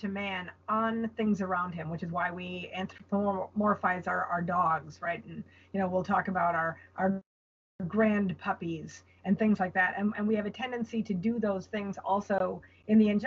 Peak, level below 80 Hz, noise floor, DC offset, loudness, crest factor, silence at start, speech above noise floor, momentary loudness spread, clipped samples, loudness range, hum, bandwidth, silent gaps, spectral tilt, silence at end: -14 dBFS; -68 dBFS; under -90 dBFS; under 0.1%; -31 LUFS; 16 dB; 0 s; over 59 dB; 11 LU; under 0.1%; 2 LU; none; 7.2 kHz; 7.26-7.79 s; -5.5 dB/octave; 0 s